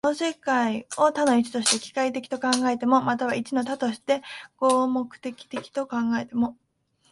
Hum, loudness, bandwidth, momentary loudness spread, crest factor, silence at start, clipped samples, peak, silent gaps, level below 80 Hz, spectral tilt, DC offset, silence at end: none; -25 LUFS; 11.5 kHz; 9 LU; 22 dB; 0.05 s; under 0.1%; -4 dBFS; none; -68 dBFS; -3 dB/octave; under 0.1%; 0.6 s